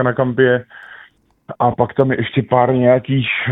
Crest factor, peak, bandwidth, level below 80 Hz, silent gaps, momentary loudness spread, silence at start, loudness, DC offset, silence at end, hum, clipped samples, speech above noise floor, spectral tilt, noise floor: 16 dB; 0 dBFS; 4 kHz; -52 dBFS; none; 12 LU; 0 s; -16 LUFS; under 0.1%; 0 s; none; under 0.1%; 32 dB; -10 dB/octave; -48 dBFS